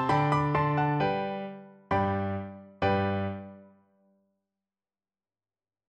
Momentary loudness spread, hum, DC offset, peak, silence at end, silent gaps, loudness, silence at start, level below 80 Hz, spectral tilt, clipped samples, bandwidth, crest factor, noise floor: 16 LU; none; under 0.1%; -12 dBFS; 2.25 s; none; -29 LUFS; 0 s; -58 dBFS; -8 dB/octave; under 0.1%; 9 kHz; 18 dB; under -90 dBFS